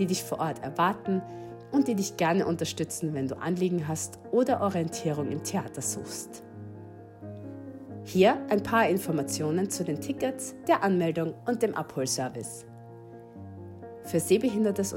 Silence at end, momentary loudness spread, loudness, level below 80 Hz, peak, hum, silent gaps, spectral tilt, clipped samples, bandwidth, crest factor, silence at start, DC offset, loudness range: 0 s; 20 LU; -28 LUFS; -66 dBFS; -10 dBFS; none; none; -5 dB/octave; under 0.1%; 16.5 kHz; 20 dB; 0 s; under 0.1%; 4 LU